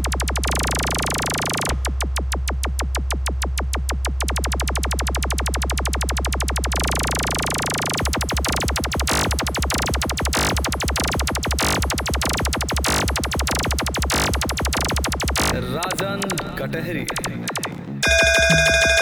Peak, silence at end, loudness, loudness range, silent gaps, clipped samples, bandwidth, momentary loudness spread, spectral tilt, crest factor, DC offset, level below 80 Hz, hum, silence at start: -4 dBFS; 0 s; -21 LUFS; 3 LU; none; under 0.1%; over 20 kHz; 5 LU; -3 dB/octave; 18 dB; under 0.1%; -26 dBFS; none; 0 s